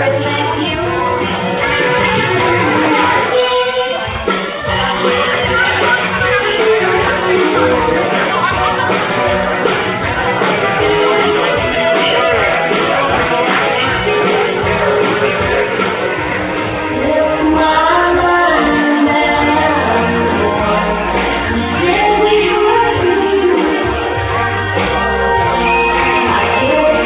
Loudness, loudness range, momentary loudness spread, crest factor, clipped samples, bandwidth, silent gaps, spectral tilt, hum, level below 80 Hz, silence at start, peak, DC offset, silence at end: -12 LUFS; 2 LU; 4 LU; 12 dB; under 0.1%; 4 kHz; none; -9 dB/octave; none; -32 dBFS; 0 s; 0 dBFS; under 0.1%; 0 s